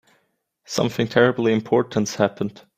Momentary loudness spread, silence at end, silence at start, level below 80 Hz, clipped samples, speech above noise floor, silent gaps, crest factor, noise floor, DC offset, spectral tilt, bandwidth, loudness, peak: 7 LU; 0.25 s; 0.7 s; -60 dBFS; under 0.1%; 48 dB; none; 20 dB; -69 dBFS; under 0.1%; -5.5 dB/octave; 15.5 kHz; -21 LUFS; -2 dBFS